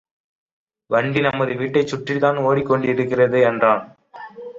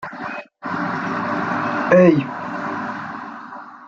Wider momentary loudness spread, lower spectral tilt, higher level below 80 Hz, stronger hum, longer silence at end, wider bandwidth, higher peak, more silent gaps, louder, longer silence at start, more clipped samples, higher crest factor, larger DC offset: second, 7 LU vs 19 LU; about the same, -7 dB/octave vs -8 dB/octave; about the same, -58 dBFS vs -62 dBFS; neither; about the same, 0 s vs 0 s; about the same, 7.8 kHz vs 7.2 kHz; about the same, -2 dBFS vs -2 dBFS; neither; about the same, -19 LUFS vs -20 LUFS; first, 0.9 s vs 0 s; neither; about the same, 18 dB vs 18 dB; neither